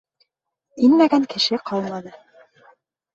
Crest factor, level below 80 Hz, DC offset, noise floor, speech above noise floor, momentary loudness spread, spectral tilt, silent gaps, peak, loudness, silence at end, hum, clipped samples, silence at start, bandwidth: 18 dB; -66 dBFS; under 0.1%; -77 dBFS; 58 dB; 14 LU; -5 dB/octave; none; -4 dBFS; -19 LUFS; 1.05 s; none; under 0.1%; 0.75 s; 7.8 kHz